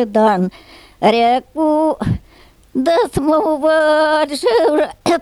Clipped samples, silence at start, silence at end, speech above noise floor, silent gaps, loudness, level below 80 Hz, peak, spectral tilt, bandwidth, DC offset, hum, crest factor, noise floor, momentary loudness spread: under 0.1%; 0 s; 0 s; 32 dB; none; -15 LUFS; -42 dBFS; -2 dBFS; -5.5 dB/octave; 13.5 kHz; under 0.1%; none; 14 dB; -46 dBFS; 7 LU